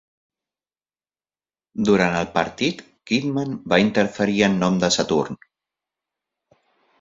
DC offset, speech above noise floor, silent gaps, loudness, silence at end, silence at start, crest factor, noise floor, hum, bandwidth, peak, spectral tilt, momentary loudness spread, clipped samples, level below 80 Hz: under 0.1%; over 70 dB; none; -21 LUFS; 1.65 s; 1.75 s; 22 dB; under -90 dBFS; none; 7.8 kHz; -2 dBFS; -5 dB/octave; 9 LU; under 0.1%; -54 dBFS